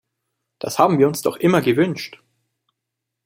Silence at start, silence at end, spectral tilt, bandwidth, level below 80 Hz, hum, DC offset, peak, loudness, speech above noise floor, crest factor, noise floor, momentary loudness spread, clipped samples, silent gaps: 0.65 s; 1.1 s; -6 dB/octave; 16.5 kHz; -62 dBFS; none; under 0.1%; -2 dBFS; -18 LUFS; 63 dB; 20 dB; -81 dBFS; 15 LU; under 0.1%; none